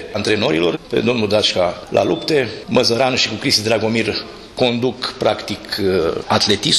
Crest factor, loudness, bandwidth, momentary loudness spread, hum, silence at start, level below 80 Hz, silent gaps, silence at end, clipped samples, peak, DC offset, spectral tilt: 14 dB; -17 LUFS; 13.5 kHz; 6 LU; none; 0 s; -48 dBFS; none; 0 s; under 0.1%; -2 dBFS; under 0.1%; -4 dB/octave